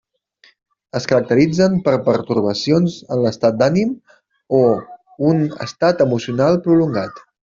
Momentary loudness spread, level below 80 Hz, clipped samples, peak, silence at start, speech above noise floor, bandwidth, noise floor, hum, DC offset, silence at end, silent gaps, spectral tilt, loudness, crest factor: 9 LU; -54 dBFS; under 0.1%; -2 dBFS; 0.95 s; 38 dB; 7.6 kHz; -54 dBFS; none; under 0.1%; 0.4 s; none; -7 dB/octave; -17 LUFS; 14 dB